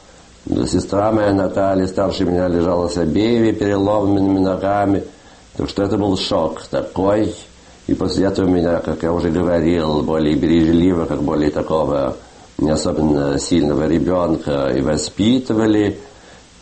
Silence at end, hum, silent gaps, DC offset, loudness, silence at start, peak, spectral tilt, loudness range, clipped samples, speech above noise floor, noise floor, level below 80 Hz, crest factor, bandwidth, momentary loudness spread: 0.5 s; none; none; under 0.1%; -17 LUFS; 0.45 s; -4 dBFS; -6.5 dB/octave; 2 LU; under 0.1%; 26 dB; -43 dBFS; -38 dBFS; 14 dB; 8.8 kHz; 7 LU